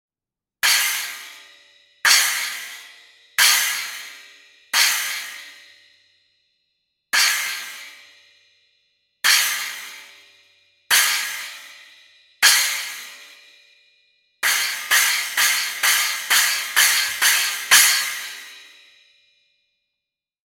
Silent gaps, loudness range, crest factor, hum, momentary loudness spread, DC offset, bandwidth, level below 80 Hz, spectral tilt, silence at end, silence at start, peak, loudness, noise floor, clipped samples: none; 8 LU; 20 dB; none; 21 LU; under 0.1%; 17 kHz; -76 dBFS; 4.5 dB/octave; 1.85 s; 0.65 s; -2 dBFS; -17 LUFS; -90 dBFS; under 0.1%